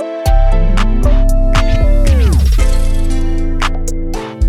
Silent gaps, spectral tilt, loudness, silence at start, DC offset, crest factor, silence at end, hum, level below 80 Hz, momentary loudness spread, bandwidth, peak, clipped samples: none; -6 dB/octave; -15 LUFS; 0 s; under 0.1%; 8 dB; 0 s; none; -10 dBFS; 7 LU; 12.5 kHz; 0 dBFS; under 0.1%